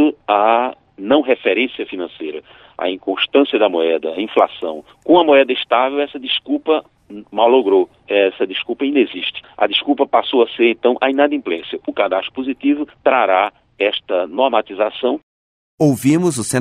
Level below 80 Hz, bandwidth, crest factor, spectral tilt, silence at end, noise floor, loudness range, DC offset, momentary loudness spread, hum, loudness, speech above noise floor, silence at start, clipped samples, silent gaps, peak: -62 dBFS; 13 kHz; 16 dB; -4.5 dB/octave; 0 s; under -90 dBFS; 3 LU; under 0.1%; 10 LU; none; -17 LUFS; over 74 dB; 0 s; under 0.1%; 15.23-15.78 s; 0 dBFS